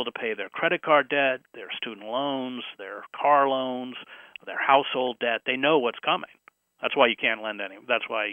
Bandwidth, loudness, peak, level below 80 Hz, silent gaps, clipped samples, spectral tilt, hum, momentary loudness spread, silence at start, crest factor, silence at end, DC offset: 3.7 kHz; -25 LUFS; -4 dBFS; -82 dBFS; none; under 0.1%; -6 dB/octave; none; 15 LU; 0 s; 22 dB; 0 s; under 0.1%